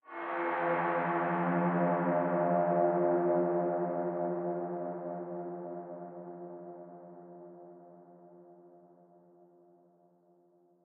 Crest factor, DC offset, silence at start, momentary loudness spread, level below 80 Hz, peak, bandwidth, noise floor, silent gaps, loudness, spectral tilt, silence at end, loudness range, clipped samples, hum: 18 dB; under 0.1%; 0.05 s; 22 LU; under -90 dBFS; -16 dBFS; 3.9 kHz; -67 dBFS; none; -32 LUFS; -7.5 dB/octave; 2.1 s; 21 LU; under 0.1%; none